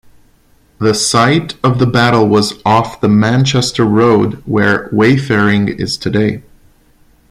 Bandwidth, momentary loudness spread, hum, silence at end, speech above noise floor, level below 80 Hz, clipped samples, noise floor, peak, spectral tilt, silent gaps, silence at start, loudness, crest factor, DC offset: 14.5 kHz; 6 LU; none; 0.9 s; 39 dB; -42 dBFS; under 0.1%; -50 dBFS; 0 dBFS; -5.5 dB/octave; none; 0.8 s; -12 LUFS; 12 dB; under 0.1%